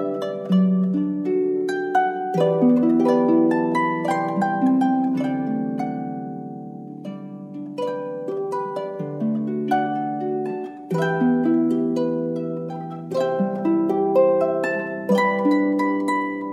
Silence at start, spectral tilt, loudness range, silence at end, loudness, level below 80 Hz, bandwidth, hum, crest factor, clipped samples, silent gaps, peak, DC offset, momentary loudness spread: 0 s; -8 dB/octave; 9 LU; 0 s; -22 LUFS; -72 dBFS; 11 kHz; none; 14 dB; under 0.1%; none; -6 dBFS; under 0.1%; 13 LU